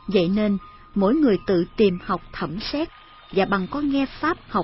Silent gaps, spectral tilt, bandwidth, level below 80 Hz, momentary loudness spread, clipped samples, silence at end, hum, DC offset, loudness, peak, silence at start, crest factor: none; -10.5 dB/octave; 5.8 kHz; -46 dBFS; 9 LU; under 0.1%; 0 s; none; under 0.1%; -23 LUFS; -6 dBFS; 0.05 s; 16 dB